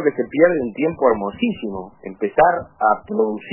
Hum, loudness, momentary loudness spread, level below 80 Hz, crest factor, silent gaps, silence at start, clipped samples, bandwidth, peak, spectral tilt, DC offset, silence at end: none; -19 LUFS; 12 LU; -52 dBFS; 16 dB; none; 0 s; under 0.1%; 3.1 kHz; -2 dBFS; -10.5 dB/octave; under 0.1%; 0 s